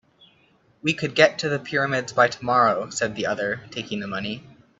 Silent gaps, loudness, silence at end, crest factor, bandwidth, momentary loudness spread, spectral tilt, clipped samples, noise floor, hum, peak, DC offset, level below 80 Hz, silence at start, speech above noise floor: none; -23 LUFS; 0.4 s; 22 dB; 8 kHz; 11 LU; -4 dB/octave; under 0.1%; -60 dBFS; none; -2 dBFS; under 0.1%; -62 dBFS; 0.85 s; 37 dB